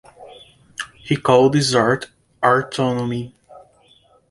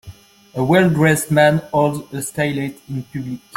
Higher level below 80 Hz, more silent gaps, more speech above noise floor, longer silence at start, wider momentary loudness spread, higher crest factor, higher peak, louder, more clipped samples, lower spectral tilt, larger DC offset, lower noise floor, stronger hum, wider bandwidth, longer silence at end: about the same, -56 dBFS vs -52 dBFS; neither; first, 38 dB vs 24 dB; first, 0.2 s vs 0.05 s; first, 19 LU vs 14 LU; about the same, 20 dB vs 18 dB; about the same, 0 dBFS vs -2 dBFS; about the same, -18 LUFS vs -17 LUFS; neither; about the same, -5 dB/octave vs -5.5 dB/octave; neither; first, -55 dBFS vs -41 dBFS; neither; second, 11.5 kHz vs 16.5 kHz; first, 0.7 s vs 0.2 s